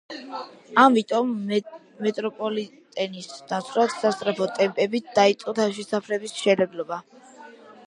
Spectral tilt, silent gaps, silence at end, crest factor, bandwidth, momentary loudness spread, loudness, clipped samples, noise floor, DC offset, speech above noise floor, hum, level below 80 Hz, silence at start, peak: -4.5 dB/octave; none; 0.15 s; 22 dB; 11 kHz; 15 LU; -24 LUFS; under 0.1%; -46 dBFS; under 0.1%; 22 dB; none; -74 dBFS; 0.1 s; -2 dBFS